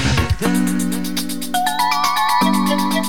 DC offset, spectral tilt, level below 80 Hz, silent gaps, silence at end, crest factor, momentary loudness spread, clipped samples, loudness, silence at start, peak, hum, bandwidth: 4%; -4 dB/octave; -32 dBFS; none; 0 s; 14 dB; 6 LU; under 0.1%; -18 LUFS; 0 s; -4 dBFS; none; 19 kHz